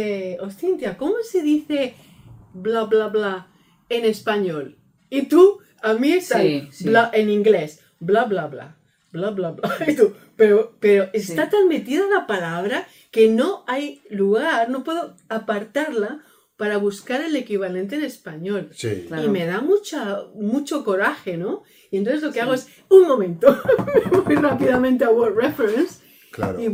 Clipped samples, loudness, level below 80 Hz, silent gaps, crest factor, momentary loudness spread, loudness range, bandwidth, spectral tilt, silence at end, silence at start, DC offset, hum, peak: under 0.1%; -20 LUFS; -60 dBFS; none; 20 dB; 12 LU; 7 LU; 16.5 kHz; -6 dB/octave; 0 s; 0 s; under 0.1%; none; 0 dBFS